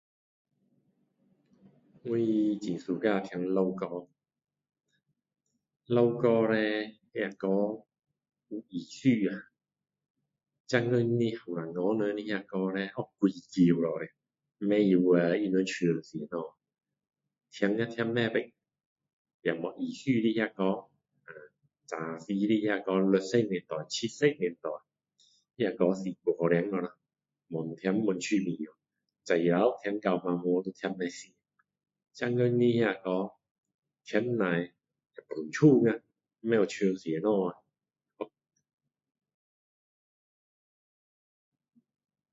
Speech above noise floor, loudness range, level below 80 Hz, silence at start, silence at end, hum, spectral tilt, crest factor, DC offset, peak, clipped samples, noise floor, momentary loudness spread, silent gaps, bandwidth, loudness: 60 dB; 5 LU; -76 dBFS; 2.05 s; 4.05 s; none; -6.5 dB/octave; 22 dB; under 0.1%; -10 dBFS; under 0.1%; -89 dBFS; 14 LU; 10.10-10.14 s, 10.60-10.64 s, 18.86-18.96 s, 19.13-19.25 s, 19.34-19.40 s, 33.51-33.63 s, 33.74-33.79 s; 8 kHz; -30 LUFS